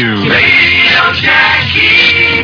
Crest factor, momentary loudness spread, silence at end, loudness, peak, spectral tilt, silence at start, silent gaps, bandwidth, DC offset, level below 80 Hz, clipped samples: 8 dB; 3 LU; 0 s; -6 LUFS; 0 dBFS; -4.5 dB/octave; 0 s; none; 5.4 kHz; under 0.1%; -36 dBFS; 1%